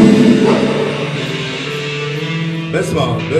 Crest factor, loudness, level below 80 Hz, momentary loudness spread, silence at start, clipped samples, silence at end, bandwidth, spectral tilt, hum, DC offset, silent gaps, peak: 14 dB; -15 LUFS; -46 dBFS; 10 LU; 0 s; 0.3%; 0 s; 12.5 kHz; -6 dB/octave; none; under 0.1%; none; 0 dBFS